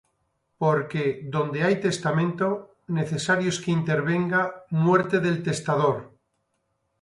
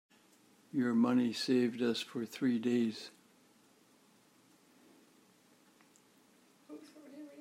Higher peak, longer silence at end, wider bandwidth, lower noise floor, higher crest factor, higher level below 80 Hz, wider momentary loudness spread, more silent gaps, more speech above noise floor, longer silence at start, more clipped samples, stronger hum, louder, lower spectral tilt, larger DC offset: first, -8 dBFS vs -20 dBFS; first, 0.95 s vs 0 s; second, 11.5 kHz vs 15 kHz; first, -74 dBFS vs -67 dBFS; about the same, 18 dB vs 18 dB; first, -64 dBFS vs -90 dBFS; second, 6 LU vs 23 LU; neither; first, 51 dB vs 34 dB; second, 0.6 s vs 0.75 s; neither; neither; first, -24 LUFS vs -33 LUFS; about the same, -6 dB/octave vs -5.5 dB/octave; neither